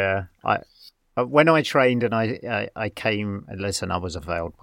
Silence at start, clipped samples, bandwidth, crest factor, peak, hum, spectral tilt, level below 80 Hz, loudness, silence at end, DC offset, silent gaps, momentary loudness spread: 0 s; under 0.1%; 16.5 kHz; 20 dB; -4 dBFS; none; -5.5 dB/octave; -52 dBFS; -23 LUFS; 0.1 s; under 0.1%; none; 12 LU